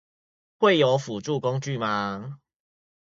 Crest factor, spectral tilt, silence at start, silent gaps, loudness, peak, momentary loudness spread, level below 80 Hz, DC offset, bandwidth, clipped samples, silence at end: 18 dB; -5.5 dB/octave; 0.6 s; none; -24 LUFS; -8 dBFS; 12 LU; -66 dBFS; under 0.1%; 7.8 kHz; under 0.1%; 0.7 s